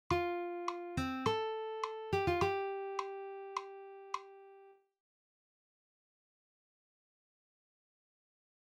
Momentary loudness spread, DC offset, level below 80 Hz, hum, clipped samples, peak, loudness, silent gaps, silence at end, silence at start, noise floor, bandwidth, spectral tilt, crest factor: 14 LU; under 0.1%; -62 dBFS; none; under 0.1%; -20 dBFS; -38 LUFS; none; 3.95 s; 0.1 s; -61 dBFS; 16 kHz; -5.5 dB/octave; 22 dB